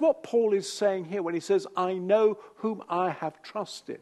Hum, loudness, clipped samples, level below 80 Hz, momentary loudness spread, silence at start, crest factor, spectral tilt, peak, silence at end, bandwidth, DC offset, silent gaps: none; -28 LUFS; under 0.1%; -80 dBFS; 12 LU; 0 s; 16 dB; -5 dB/octave; -12 dBFS; 0.05 s; 12.5 kHz; under 0.1%; none